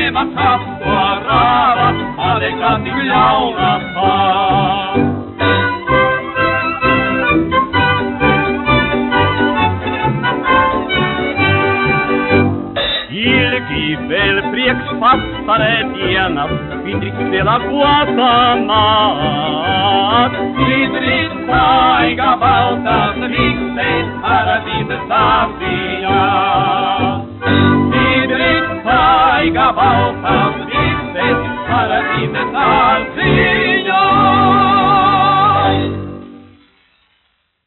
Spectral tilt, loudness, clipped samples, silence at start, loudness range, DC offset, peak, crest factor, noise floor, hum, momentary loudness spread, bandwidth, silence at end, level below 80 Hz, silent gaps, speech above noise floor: -3 dB/octave; -13 LUFS; under 0.1%; 0 s; 3 LU; under 0.1%; 0 dBFS; 14 dB; -62 dBFS; none; 6 LU; 4.3 kHz; 1.3 s; -36 dBFS; none; 49 dB